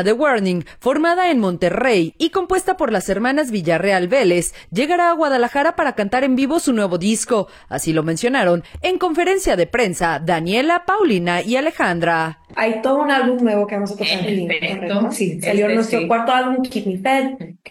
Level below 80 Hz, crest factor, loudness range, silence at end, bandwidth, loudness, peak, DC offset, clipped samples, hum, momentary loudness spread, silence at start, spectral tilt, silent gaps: -46 dBFS; 14 dB; 1 LU; 0 s; 17 kHz; -18 LUFS; -4 dBFS; under 0.1%; under 0.1%; none; 5 LU; 0 s; -4.5 dB/octave; none